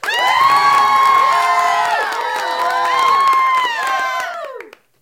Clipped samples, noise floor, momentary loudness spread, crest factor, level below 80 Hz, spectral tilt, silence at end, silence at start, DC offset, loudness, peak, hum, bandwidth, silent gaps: under 0.1%; -36 dBFS; 10 LU; 12 dB; -60 dBFS; -0.5 dB/octave; 0.35 s; 0.05 s; under 0.1%; -14 LUFS; -2 dBFS; none; 17 kHz; none